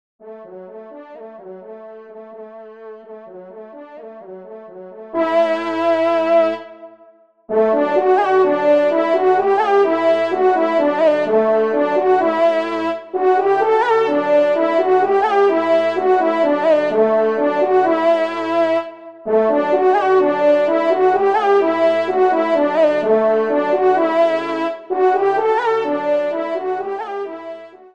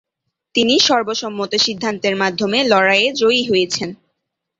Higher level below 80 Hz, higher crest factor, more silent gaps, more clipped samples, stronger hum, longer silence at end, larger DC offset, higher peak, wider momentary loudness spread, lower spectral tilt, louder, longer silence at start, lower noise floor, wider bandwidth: second, -70 dBFS vs -60 dBFS; about the same, 14 dB vs 16 dB; neither; neither; neither; second, 0.25 s vs 0.65 s; first, 0.2% vs under 0.1%; about the same, -4 dBFS vs -2 dBFS; first, 22 LU vs 9 LU; first, -6 dB/octave vs -3 dB/octave; about the same, -16 LUFS vs -16 LUFS; second, 0.25 s vs 0.55 s; second, -49 dBFS vs -77 dBFS; about the same, 8 kHz vs 8 kHz